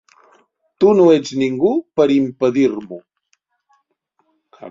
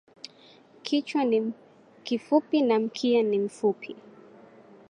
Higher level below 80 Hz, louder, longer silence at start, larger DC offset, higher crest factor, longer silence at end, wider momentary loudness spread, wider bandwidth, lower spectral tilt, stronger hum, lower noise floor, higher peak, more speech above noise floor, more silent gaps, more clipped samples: first, -60 dBFS vs -82 dBFS; first, -15 LUFS vs -26 LUFS; about the same, 0.8 s vs 0.85 s; neither; about the same, 16 dB vs 20 dB; second, 0 s vs 0.9 s; second, 14 LU vs 22 LU; second, 7.6 kHz vs 10.5 kHz; about the same, -6.5 dB/octave vs -5.5 dB/octave; neither; first, -67 dBFS vs -55 dBFS; first, -2 dBFS vs -8 dBFS; first, 52 dB vs 29 dB; neither; neither